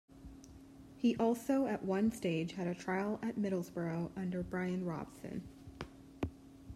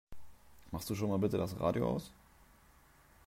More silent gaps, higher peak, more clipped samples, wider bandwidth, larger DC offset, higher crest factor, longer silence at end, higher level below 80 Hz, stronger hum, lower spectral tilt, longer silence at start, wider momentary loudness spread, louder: neither; about the same, -20 dBFS vs -18 dBFS; neither; second, 14.5 kHz vs 16 kHz; neither; about the same, 16 dB vs 20 dB; second, 0 s vs 1.15 s; about the same, -62 dBFS vs -60 dBFS; neither; about the same, -7 dB/octave vs -7 dB/octave; about the same, 0.1 s vs 0.1 s; first, 21 LU vs 12 LU; about the same, -37 LUFS vs -36 LUFS